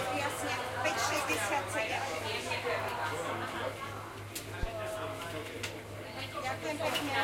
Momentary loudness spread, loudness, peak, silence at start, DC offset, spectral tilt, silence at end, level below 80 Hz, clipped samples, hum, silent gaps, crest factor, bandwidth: 10 LU; -35 LUFS; -18 dBFS; 0 s; under 0.1%; -3 dB/octave; 0 s; -54 dBFS; under 0.1%; none; none; 18 dB; 16.5 kHz